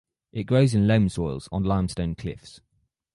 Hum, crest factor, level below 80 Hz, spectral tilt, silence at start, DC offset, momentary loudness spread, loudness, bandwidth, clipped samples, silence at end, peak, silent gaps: none; 18 dB; -42 dBFS; -7.5 dB/octave; 0.35 s; under 0.1%; 16 LU; -24 LUFS; 11.5 kHz; under 0.1%; 0.65 s; -6 dBFS; none